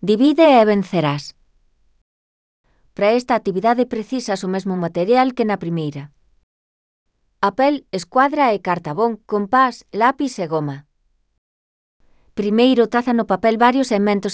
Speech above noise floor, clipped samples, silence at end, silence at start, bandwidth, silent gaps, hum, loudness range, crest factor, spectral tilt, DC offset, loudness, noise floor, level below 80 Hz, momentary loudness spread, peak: 41 dB; under 0.1%; 0 s; 0 s; 8 kHz; 2.01-2.64 s, 6.43-7.06 s, 11.38-12.00 s; none; 4 LU; 18 dB; -6 dB/octave; under 0.1%; -18 LUFS; -58 dBFS; -58 dBFS; 10 LU; 0 dBFS